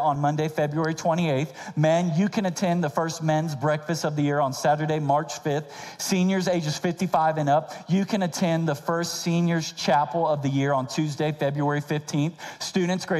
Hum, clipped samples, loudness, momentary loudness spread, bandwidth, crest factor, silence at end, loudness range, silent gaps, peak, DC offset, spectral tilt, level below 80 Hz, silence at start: none; under 0.1%; -25 LUFS; 5 LU; 14.5 kHz; 16 dB; 0 s; 1 LU; none; -8 dBFS; under 0.1%; -5.5 dB/octave; -66 dBFS; 0 s